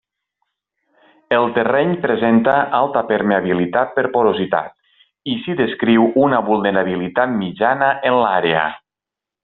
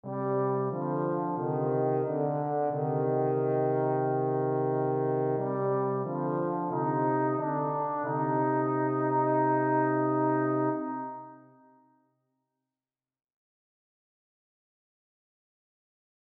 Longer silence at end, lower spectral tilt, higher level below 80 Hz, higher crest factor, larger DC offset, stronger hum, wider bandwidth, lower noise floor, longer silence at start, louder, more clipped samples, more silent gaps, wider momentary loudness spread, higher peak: second, 0.65 s vs 5 s; second, -4 dB/octave vs -13 dB/octave; first, -58 dBFS vs -82 dBFS; about the same, 16 dB vs 14 dB; neither; neither; first, 4.2 kHz vs 3 kHz; second, -86 dBFS vs under -90 dBFS; first, 1.3 s vs 0.05 s; first, -17 LUFS vs -29 LUFS; neither; neither; about the same, 6 LU vs 4 LU; first, -2 dBFS vs -16 dBFS